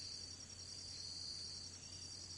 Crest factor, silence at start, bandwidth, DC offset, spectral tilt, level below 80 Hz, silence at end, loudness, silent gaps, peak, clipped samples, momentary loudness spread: 14 dB; 0 s; 11.5 kHz; under 0.1%; -1 dB/octave; -74 dBFS; 0 s; -48 LUFS; none; -36 dBFS; under 0.1%; 4 LU